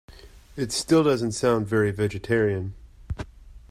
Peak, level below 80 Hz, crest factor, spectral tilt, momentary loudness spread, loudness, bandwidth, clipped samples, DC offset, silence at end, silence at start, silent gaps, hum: -8 dBFS; -46 dBFS; 16 dB; -5.5 dB/octave; 17 LU; -24 LUFS; 14 kHz; under 0.1%; under 0.1%; 0.1 s; 0.1 s; none; none